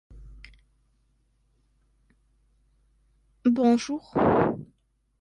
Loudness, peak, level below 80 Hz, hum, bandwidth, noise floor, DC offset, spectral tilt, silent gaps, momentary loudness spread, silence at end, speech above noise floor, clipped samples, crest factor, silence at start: -24 LUFS; -8 dBFS; -54 dBFS; none; 9.6 kHz; -68 dBFS; under 0.1%; -6.5 dB/octave; none; 7 LU; 0.55 s; 45 dB; under 0.1%; 22 dB; 0.1 s